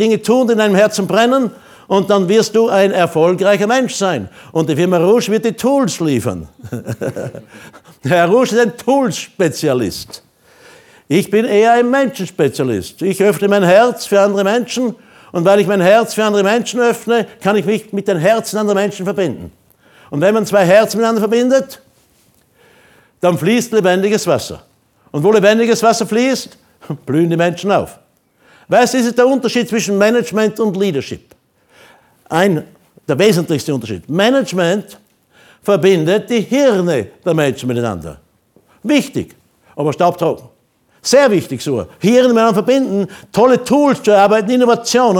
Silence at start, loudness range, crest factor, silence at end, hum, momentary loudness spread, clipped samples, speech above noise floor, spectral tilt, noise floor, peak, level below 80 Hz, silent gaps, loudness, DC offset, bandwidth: 0 s; 4 LU; 14 dB; 0 s; none; 12 LU; under 0.1%; 43 dB; -5 dB/octave; -56 dBFS; 0 dBFS; -54 dBFS; none; -14 LUFS; under 0.1%; 18.5 kHz